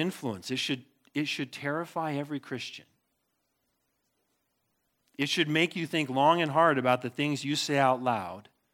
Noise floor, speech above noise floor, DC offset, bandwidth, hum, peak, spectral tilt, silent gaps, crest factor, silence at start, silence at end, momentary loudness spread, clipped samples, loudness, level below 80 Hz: -78 dBFS; 49 dB; under 0.1%; 17.5 kHz; none; -10 dBFS; -4.5 dB/octave; none; 20 dB; 0 s; 0.3 s; 13 LU; under 0.1%; -29 LUFS; -80 dBFS